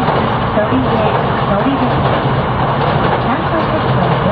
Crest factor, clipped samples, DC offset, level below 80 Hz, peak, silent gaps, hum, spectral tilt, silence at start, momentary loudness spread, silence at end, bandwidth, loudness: 14 dB; under 0.1%; under 0.1%; -30 dBFS; 0 dBFS; none; none; -10.5 dB/octave; 0 s; 1 LU; 0 s; 5 kHz; -14 LUFS